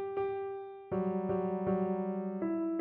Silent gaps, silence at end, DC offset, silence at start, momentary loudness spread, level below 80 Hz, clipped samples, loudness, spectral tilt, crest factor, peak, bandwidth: none; 0 s; under 0.1%; 0 s; 6 LU; -66 dBFS; under 0.1%; -35 LUFS; -9 dB/octave; 12 dB; -22 dBFS; 3.8 kHz